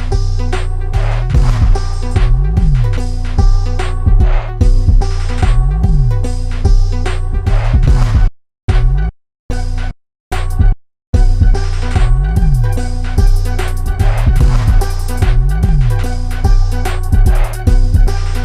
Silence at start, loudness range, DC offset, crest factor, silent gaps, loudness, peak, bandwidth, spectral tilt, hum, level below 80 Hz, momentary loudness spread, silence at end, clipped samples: 0 s; 2 LU; under 0.1%; 10 dB; 8.63-8.68 s, 9.39-9.49 s, 10.20-10.31 s, 11.07-11.13 s; -15 LUFS; 0 dBFS; 11 kHz; -6.5 dB/octave; none; -12 dBFS; 7 LU; 0 s; under 0.1%